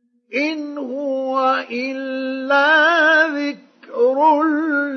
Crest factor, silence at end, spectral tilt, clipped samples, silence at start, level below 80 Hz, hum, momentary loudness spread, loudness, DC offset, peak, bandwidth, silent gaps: 14 dB; 0 s; -3 dB/octave; under 0.1%; 0.3 s; -88 dBFS; none; 14 LU; -17 LUFS; under 0.1%; -4 dBFS; 6.6 kHz; none